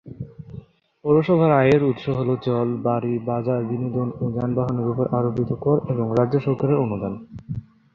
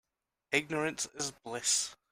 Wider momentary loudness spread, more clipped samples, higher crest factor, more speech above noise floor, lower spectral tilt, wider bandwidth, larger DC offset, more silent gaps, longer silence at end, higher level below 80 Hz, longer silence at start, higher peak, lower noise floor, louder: first, 17 LU vs 7 LU; neither; about the same, 18 dB vs 22 dB; second, 22 dB vs 30 dB; first, -10 dB/octave vs -1.5 dB/octave; second, 6.8 kHz vs 16 kHz; neither; neither; about the same, 0.3 s vs 0.2 s; first, -52 dBFS vs -72 dBFS; second, 0.05 s vs 0.5 s; first, -4 dBFS vs -14 dBFS; second, -43 dBFS vs -65 dBFS; first, -22 LUFS vs -33 LUFS